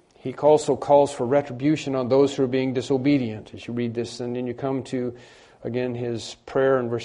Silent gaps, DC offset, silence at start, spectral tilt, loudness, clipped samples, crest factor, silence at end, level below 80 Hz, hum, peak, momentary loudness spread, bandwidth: none; under 0.1%; 0.25 s; -6.5 dB/octave; -23 LUFS; under 0.1%; 18 dB; 0 s; -60 dBFS; none; -6 dBFS; 12 LU; 10.5 kHz